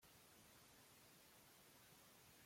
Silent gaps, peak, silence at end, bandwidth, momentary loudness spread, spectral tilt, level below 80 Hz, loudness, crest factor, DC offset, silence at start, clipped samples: none; -56 dBFS; 0 s; 16.5 kHz; 0 LU; -2.5 dB/octave; -88 dBFS; -67 LUFS; 14 dB; under 0.1%; 0 s; under 0.1%